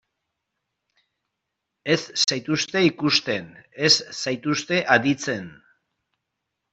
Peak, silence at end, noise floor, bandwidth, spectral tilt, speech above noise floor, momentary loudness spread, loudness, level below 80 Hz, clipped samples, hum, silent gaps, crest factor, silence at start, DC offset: -4 dBFS; 1.2 s; -81 dBFS; 8.2 kHz; -3 dB/octave; 59 dB; 12 LU; -21 LUFS; -66 dBFS; under 0.1%; none; none; 22 dB; 1.85 s; under 0.1%